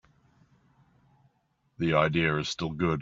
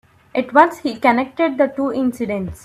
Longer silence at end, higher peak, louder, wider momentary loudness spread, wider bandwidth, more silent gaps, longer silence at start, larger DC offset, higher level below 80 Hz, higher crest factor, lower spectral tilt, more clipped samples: about the same, 0 s vs 0.1 s; second, -10 dBFS vs 0 dBFS; second, -27 LUFS vs -18 LUFS; about the same, 8 LU vs 10 LU; second, 7.6 kHz vs 14 kHz; neither; first, 1.8 s vs 0.35 s; neither; about the same, -56 dBFS vs -52 dBFS; about the same, 22 dB vs 18 dB; second, -4.5 dB/octave vs -6 dB/octave; neither